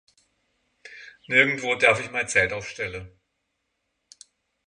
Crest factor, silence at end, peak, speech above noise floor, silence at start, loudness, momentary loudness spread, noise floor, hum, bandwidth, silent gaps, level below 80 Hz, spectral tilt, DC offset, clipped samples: 24 dB; 1.6 s; -4 dBFS; 54 dB; 0.85 s; -22 LUFS; 23 LU; -77 dBFS; none; 11.5 kHz; none; -58 dBFS; -3 dB/octave; under 0.1%; under 0.1%